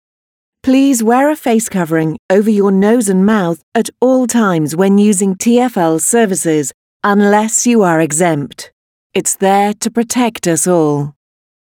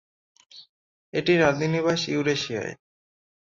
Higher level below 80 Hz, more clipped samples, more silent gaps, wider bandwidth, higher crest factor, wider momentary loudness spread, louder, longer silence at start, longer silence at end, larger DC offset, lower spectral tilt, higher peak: about the same, -58 dBFS vs -60 dBFS; neither; first, 2.19-2.29 s, 3.63-3.72 s, 6.74-7.00 s, 8.72-9.10 s vs 0.69-1.13 s; first, 18 kHz vs 7.6 kHz; second, 12 dB vs 20 dB; second, 7 LU vs 11 LU; first, -12 LUFS vs -24 LUFS; about the same, 0.65 s vs 0.55 s; second, 0.55 s vs 0.7 s; neither; about the same, -5 dB/octave vs -5 dB/octave; first, 0 dBFS vs -6 dBFS